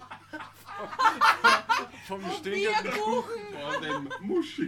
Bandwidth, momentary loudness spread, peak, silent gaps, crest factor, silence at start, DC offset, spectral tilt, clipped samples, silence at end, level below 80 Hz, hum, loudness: 17 kHz; 20 LU; -8 dBFS; none; 20 dB; 0 s; under 0.1%; -3 dB/octave; under 0.1%; 0 s; -68 dBFS; none; -27 LUFS